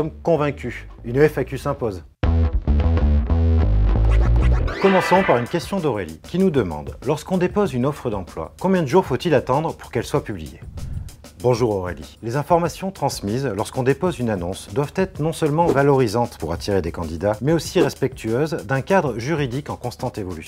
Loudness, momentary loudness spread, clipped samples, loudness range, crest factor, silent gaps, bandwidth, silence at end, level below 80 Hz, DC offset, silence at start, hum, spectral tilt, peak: -21 LUFS; 10 LU; under 0.1%; 4 LU; 18 dB; none; 16 kHz; 0 s; -26 dBFS; under 0.1%; 0 s; none; -6.5 dB/octave; -2 dBFS